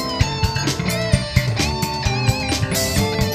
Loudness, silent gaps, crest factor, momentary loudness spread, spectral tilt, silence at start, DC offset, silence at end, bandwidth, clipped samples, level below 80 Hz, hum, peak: -20 LUFS; none; 20 dB; 2 LU; -4.5 dB/octave; 0 s; under 0.1%; 0 s; 16 kHz; under 0.1%; -30 dBFS; none; 0 dBFS